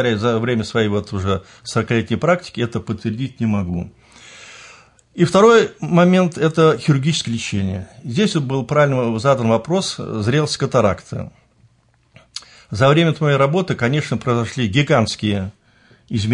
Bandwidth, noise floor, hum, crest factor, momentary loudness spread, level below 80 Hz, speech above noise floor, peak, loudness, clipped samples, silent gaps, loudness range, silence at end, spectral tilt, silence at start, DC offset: 11 kHz; -57 dBFS; none; 16 dB; 15 LU; -52 dBFS; 40 dB; -2 dBFS; -18 LUFS; under 0.1%; none; 6 LU; 0 s; -6 dB/octave; 0 s; under 0.1%